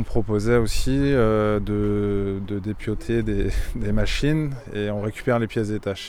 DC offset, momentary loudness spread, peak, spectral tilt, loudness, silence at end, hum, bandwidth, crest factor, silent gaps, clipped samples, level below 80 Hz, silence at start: under 0.1%; 8 LU; -6 dBFS; -6.5 dB/octave; -24 LUFS; 0 s; none; 15 kHz; 16 dB; none; under 0.1%; -30 dBFS; 0 s